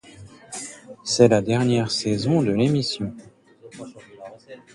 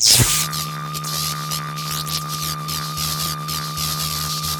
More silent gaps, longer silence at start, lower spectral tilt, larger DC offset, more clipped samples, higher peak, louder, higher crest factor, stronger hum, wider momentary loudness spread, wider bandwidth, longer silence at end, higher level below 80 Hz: neither; first, 0.2 s vs 0 s; first, -5.5 dB/octave vs -2 dB/octave; neither; neither; about the same, -2 dBFS vs 0 dBFS; about the same, -21 LUFS vs -21 LUFS; about the same, 22 dB vs 22 dB; neither; first, 24 LU vs 8 LU; second, 11.5 kHz vs 19.5 kHz; first, 0.2 s vs 0 s; second, -56 dBFS vs -42 dBFS